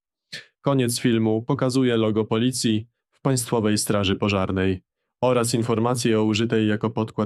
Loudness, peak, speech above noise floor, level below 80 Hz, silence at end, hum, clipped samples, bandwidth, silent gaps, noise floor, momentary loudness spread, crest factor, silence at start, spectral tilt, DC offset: -22 LUFS; -6 dBFS; 21 dB; -58 dBFS; 0 s; none; under 0.1%; 14.5 kHz; none; -42 dBFS; 6 LU; 16 dB; 0.3 s; -5.5 dB/octave; under 0.1%